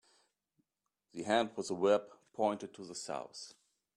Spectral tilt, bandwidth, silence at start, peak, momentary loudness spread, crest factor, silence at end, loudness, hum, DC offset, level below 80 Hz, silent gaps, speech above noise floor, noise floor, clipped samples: -4 dB/octave; 11.5 kHz; 1.15 s; -16 dBFS; 19 LU; 22 dB; 0.45 s; -36 LUFS; none; under 0.1%; -82 dBFS; none; 52 dB; -88 dBFS; under 0.1%